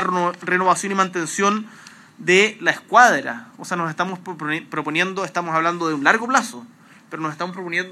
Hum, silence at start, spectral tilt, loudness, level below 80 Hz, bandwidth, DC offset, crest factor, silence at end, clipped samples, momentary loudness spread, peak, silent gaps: none; 0 s; -3.5 dB/octave; -20 LUFS; -82 dBFS; 14 kHz; under 0.1%; 20 dB; 0 s; under 0.1%; 14 LU; 0 dBFS; none